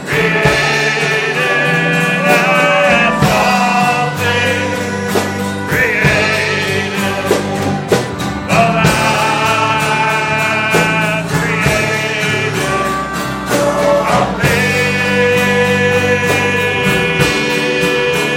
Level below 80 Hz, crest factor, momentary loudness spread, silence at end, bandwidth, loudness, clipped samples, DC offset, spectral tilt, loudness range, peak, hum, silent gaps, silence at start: -38 dBFS; 14 dB; 5 LU; 0 s; 16.5 kHz; -12 LUFS; under 0.1%; under 0.1%; -4.5 dB/octave; 3 LU; 0 dBFS; none; none; 0 s